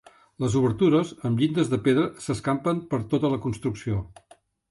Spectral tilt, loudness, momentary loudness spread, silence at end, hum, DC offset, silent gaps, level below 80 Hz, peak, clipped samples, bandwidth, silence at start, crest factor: -7 dB/octave; -25 LUFS; 9 LU; 0.6 s; none; under 0.1%; none; -52 dBFS; -10 dBFS; under 0.1%; 11.5 kHz; 0.4 s; 14 dB